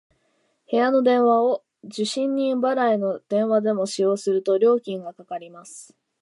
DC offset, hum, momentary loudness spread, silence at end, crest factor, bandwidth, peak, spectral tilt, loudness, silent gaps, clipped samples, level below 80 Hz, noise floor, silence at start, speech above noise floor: under 0.1%; none; 17 LU; 0.35 s; 14 dB; 11.5 kHz; -8 dBFS; -5 dB/octave; -21 LUFS; none; under 0.1%; -82 dBFS; -68 dBFS; 0.7 s; 47 dB